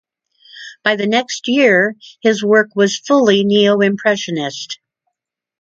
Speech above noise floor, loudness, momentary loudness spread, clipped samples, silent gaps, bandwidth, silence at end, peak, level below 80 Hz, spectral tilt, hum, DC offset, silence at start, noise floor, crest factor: 63 dB; -14 LUFS; 14 LU; under 0.1%; none; 7.8 kHz; 0.85 s; 0 dBFS; -64 dBFS; -4.5 dB/octave; none; under 0.1%; 0.55 s; -77 dBFS; 16 dB